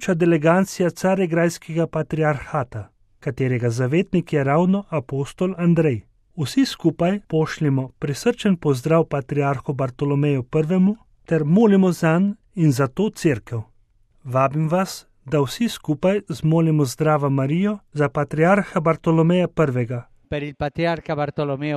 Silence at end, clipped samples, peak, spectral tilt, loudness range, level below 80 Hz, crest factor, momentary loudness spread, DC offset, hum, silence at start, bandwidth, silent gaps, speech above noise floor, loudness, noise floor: 0 s; under 0.1%; -4 dBFS; -7 dB/octave; 3 LU; -50 dBFS; 16 dB; 9 LU; under 0.1%; none; 0 s; 14.5 kHz; none; 38 dB; -21 LUFS; -57 dBFS